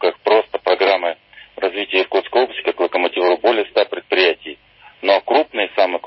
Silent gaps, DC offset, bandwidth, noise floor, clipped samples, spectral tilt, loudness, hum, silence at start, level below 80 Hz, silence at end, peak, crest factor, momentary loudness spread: none; under 0.1%; 5.8 kHz; -46 dBFS; under 0.1%; -7 dB/octave; -17 LUFS; none; 0 s; -64 dBFS; 0 s; 0 dBFS; 16 dB; 8 LU